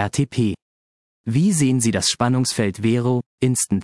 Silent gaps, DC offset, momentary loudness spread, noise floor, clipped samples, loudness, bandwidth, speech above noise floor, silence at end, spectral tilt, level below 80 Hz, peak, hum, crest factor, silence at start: 0.62-1.24 s, 3.26-3.38 s; under 0.1%; 6 LU; under -90 dBFS; under 0.1%; -20 LUFS; 12 kHz; over 71 dB; 0 s; -5 dB/octave; -56 dBFS; -4 dBFS; none; 16 dB; 0 s